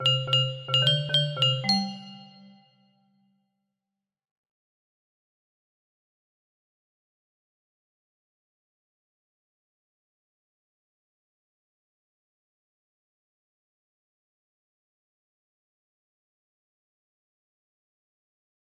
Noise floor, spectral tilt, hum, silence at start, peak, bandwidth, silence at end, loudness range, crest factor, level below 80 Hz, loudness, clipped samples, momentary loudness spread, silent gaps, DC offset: -88 dBFS; -4.5 dB/octave; none; 0 s; -10 dBFS; 12.5 kHz; 16.45 s; 9 LU; 26 dB; -76 dBFS; -23 LUFS; under 0.1%; 14 LU; none; under 0.1%